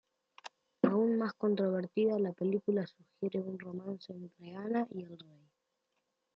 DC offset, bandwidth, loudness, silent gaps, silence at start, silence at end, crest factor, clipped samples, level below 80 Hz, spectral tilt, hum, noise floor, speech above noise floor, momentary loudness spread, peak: under 0.1%; 7.2 kHz; -34 LUFS; none; 0.45 s; 1.15 s; 22 dB; under 0.1%; -84 dBFS; -9 dB/octave; none; -83 dBFS; 48 dB; 20 LU; -14 dBFS